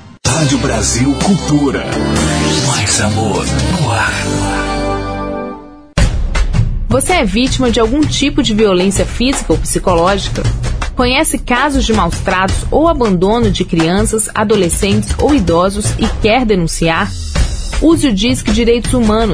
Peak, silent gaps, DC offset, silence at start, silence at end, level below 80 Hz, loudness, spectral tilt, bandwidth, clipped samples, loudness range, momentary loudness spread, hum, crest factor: 0 dBFS; none; under 0.1%; 0 s; 0 s; -20 dBFS; -13 LUFS; -4.5 dB/octave; 11 kHz; under 0.1%; 3 LU; 6 LU; none; 12 dB